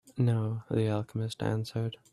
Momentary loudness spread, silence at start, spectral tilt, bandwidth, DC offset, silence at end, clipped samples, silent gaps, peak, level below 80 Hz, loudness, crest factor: 7 LU; 0.05 s; -7.5 dB/octave; 12 kHz; under 0.1%; 0.2 s; under 0.1%; none; -16 dBFS; -62 dBFS; -32 LUFS; 16 dB